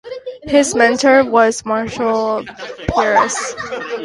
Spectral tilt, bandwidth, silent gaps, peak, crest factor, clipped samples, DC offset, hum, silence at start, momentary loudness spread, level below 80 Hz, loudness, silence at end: -3.5 dB/octave; 11.5 kHz; none; 0 dBFS; 16 dB; under 0.1%; under 0.1%; none; 0.05 s; 14 LU; -42 dBFS; -15 LUFS; 0 s